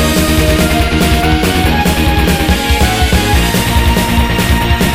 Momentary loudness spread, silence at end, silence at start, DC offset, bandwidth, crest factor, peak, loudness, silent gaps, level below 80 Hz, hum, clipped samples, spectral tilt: 1 LU; 0 s; 0 s; under 0.1%; 16.5 kHz; 10 dB; 0 dBFS; -11 LUFS; none; -16 dBFS; none; under 0.1%; -4.5 dB/octave